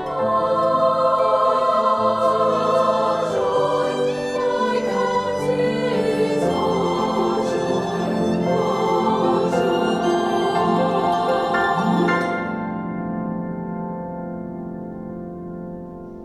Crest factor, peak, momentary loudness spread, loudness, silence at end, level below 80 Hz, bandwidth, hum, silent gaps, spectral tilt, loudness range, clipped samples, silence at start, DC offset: 14 dB; -6 dBFS; 12 LU; -20 LUFS; 0 s; -52 dBFS; 13.5 kHz; none; none; -6 dB/octave; 6 LU; under 0.1%; 0 s; under 0.1%